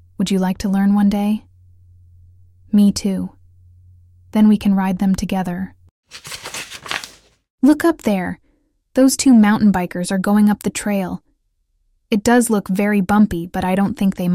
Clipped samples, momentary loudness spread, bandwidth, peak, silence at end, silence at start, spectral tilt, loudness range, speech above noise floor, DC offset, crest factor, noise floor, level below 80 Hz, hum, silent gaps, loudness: under 0.1%; 14 LU; 15.5 kHz; -2 dBFS; 0 s; 0.2 s; -5.5 dB/octave; 5 LU; 50 dB; under 0.1%; 16 dB; -65 dBFS; -44 dBFS; none; 5.91-6.03 s, 7.50-7.58 s; -17 LUFS